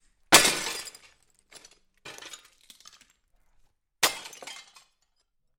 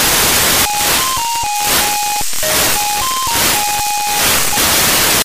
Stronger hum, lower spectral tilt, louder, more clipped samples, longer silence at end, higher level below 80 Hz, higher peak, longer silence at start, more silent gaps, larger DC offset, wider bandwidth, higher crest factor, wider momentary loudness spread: neither; about the same, 0 dB/octave vs -0.5 dB/octave; second, -22 LUFS vs -12 LUFS; neither; first, 1 s vs 0 s; second, -60 dBFS vs -34 dBFS; about the same, -2 dBFS vs 0 dBFS; first, 0.3 s vs 0 s; neither; second, under 0.1% vs 3%; about the same, 16.5 kHz vs 16 kHz; first, 28 dB vs 14 dB; first, 27 LU vs 5 LU